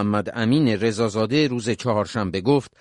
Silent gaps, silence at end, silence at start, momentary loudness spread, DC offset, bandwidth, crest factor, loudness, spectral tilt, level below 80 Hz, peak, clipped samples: none; 0.15 s; 0 s; 4 LU; under 0.1%; 11.5 kHz; 14 dB; -22 LUFS; -6 dB/octave; -56 dBFS; -6 dBFS; under 0.1%